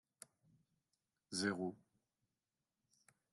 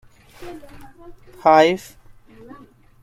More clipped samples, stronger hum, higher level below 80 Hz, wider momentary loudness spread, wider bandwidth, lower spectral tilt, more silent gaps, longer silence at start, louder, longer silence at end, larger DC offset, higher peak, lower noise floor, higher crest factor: neither; neither; second, under -90 dBFS vs -52 dBFS; second, 21 LU vs 26 LU; second, 11.5 kHz vs 15.5 kHz; about the same, -4 dB/octave vs -5 dB/octave; neither; first, 1.3 s vs 0.4 s; second, -43 LUFS vs -16 LUFS; first, 1.55 s vs 1.25 s; neither; second, -26 dBFS vs -2 dBFS; first, under -90 dBFS vs -46 dBFS; about the same, 24 dB vs 20 dB